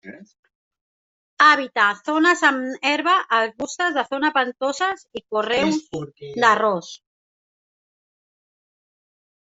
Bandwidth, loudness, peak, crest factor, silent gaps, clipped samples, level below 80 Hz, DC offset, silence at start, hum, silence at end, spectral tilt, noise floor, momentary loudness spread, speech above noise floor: 8 kHz; -19 LUFS; -2 dBFS; 20 dB; 0.39-0.43 s, 0.55-0.71 s, 0.81-1.37 s; under 0.1%; -66 dBFS; under 0.1%; 0.05 s; none; 2.5 s; -3 dB/octave; under -90 dBFS; 12 LU; over 70 dB